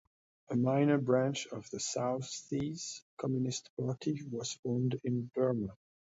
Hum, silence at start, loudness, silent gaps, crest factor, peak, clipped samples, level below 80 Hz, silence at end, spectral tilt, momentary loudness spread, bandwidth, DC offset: none; 0.5 s; -35 LUFS; 3.02-3.17 s, 3.70-3.77 s, 4.59-4.63 s; 18 dB; -16 dBFS; under 0.1%; -70 dBFS; 0.35 s; -5.5 dB/octave; 10 LU; 8 kHz; under 0.1%